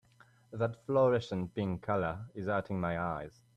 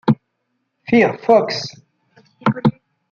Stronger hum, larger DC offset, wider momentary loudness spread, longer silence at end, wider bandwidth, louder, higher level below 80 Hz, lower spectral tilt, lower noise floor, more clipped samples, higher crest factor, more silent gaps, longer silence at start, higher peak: neither; neither; about the same, 9 LU vs 11 LU; second, 0.25 s vs 0.4 s; first, 9.6 kHz vs 7.2 kHz; second, -34 LUFS vs -17 LUFS; about the same, -62 dBFS vs -58 dBFS; first, -8 dB/octave vs -6.5 dB/octave; second, -64 dBFS vs -72 dBFS; neither; about the same, 16 dB vs 16 dB; neither; first, 0.5 s vs 0.05 s; second, -18 dBFS vs -2 dBFS